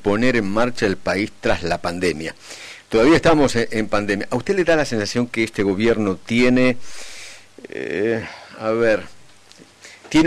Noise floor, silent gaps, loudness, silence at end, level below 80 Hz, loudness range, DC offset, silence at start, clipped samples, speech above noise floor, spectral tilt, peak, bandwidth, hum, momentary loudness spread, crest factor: -48 dBFS; none; -19 LUFS; 0 s; -40 dBFS; 4 LU; under 0.1%; 0 s; under 0.1%; 29 dB; -5.5 dB/octave; -6 dBFS; 13.5 kHz; none; 19 LU; 12 dB